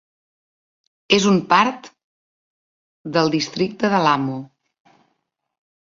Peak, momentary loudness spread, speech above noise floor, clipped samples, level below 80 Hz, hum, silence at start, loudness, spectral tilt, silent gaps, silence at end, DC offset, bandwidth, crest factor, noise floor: 0 dBFS; 14 LU; 56 dB; under 0.1%; -62 dBFS; none; 1.1 s; -18 LUFS; -4.5 dB/octave; 2.04-3.05 s; 1.5 s; under 0.1%; 7.6 kHz; 22 dB; -74 dBFS